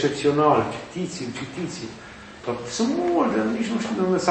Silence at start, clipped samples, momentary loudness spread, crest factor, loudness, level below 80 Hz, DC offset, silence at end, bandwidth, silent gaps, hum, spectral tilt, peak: 0 s; under 0.1%; 15 LU; 20 dB; -24 LUFS; -56 dBFS; under 0.1%; 0 s; 8.8 kHz; none; none; -5.5 dB/octave; -4 dBFS